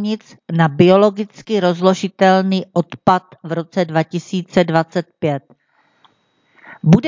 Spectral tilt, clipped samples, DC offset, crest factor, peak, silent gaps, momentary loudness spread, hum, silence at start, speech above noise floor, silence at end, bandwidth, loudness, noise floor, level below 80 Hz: -7 dB/octave; under 0.1%; under 0.1%; 16 dB; 0 dBFS; none; 11 LU; none; 0 s; 44 dB; 0 s; 7.6 kHz; -17 LUFS; -60 dBFS; -52 dBFS